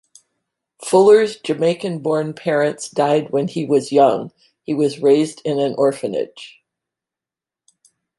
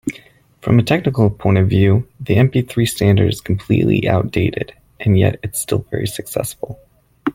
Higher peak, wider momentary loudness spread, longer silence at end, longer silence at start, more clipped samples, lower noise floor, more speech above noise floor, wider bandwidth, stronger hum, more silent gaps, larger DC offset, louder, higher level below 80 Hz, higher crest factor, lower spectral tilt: about the same, -2 dBFS vs 0 dBFS; about the same, 12 LU vs 12 LU; first, 1.7 s vs 0 s; first, 0.8 s vs 0.05 s; neither; first, -89 dBFS vs -45 dBFS; first, 72 dB vs 30 dB; second, 11.5 kHz vs 16 kHz; neither; neither; neither; about the same, -17 LUFS vs -17 LUFS; second, -68 dBFS vs -42 dBFS; about the same, 16 dB vs 16 dB; about the same, -5.5 dB/octave vs -6.5 dB/octave